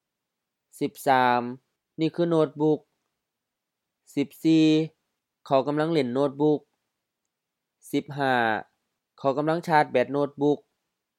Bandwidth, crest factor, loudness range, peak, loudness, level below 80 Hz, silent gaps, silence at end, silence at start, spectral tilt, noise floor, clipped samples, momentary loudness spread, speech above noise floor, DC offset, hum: 15 kHz; 20 dB; 3 LU; -6 dBFS; -25 LUFS; -80 dBFS; none; 0.65 s; 0.8 s; -6.5 dB/octave; -85 dBFS; under 0.1%; 10 LU; 61 dB; under 0.1%; none